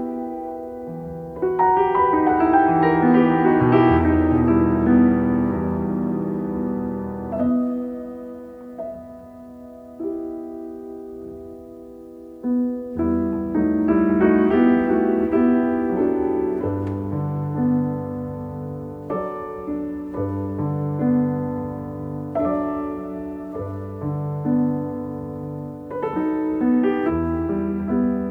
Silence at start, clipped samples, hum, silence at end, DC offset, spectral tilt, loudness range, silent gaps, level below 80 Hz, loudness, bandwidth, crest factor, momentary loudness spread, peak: 0 s; under 0.1%; none; 0 s; under 0.1%; -10.5 dB/octave; 12 LU; none; -44 dBFS; -21 LUFS; 4.4 kHz; 18 dB; 17 LU; -4 dBFS